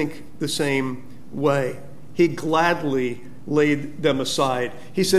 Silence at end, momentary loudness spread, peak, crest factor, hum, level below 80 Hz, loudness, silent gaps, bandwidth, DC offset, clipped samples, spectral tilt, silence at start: 0 s; 12 LU; -6 dBFS; 18 dB; none; -58 dBFS; -23 LUFS; none; 15 kHz; 2%; under 0.1%; -5 dB/octave; 0 s